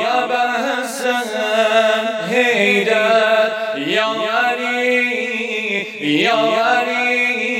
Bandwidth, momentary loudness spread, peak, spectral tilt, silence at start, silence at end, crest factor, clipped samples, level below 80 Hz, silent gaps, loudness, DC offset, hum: 17 kHz; 6 LU; 0 dBFS; -3 dB/octave; 0 s; 0 s; 16 dB; under 0.1%; -80 dBFS; none; -16 LUFS; under 0.1%; none